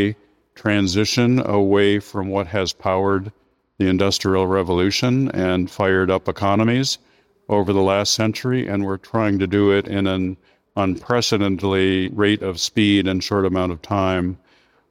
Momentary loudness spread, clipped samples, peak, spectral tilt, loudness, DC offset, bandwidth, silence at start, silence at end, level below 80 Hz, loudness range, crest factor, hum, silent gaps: 7 LU; under 0.1%; -2 dBFS; -5 dB/octave; -19 LUFS; under 0.1%; 16 kHz; 0 s; 0.55 s; -50 dBFS; 1 LU; 18 dB; none; none